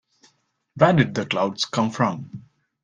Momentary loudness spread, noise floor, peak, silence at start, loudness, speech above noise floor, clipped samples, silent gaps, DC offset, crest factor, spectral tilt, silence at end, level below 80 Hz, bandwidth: 18 LU; -65 dBFS; -2 dBFS; 0.75 s; -21 LUFS; 44 dB; under 0.1%; none; under 0.1%; 22 dB; -5.5 dB/octave; 0.4 s; -58 dBFS; 9.8 kHz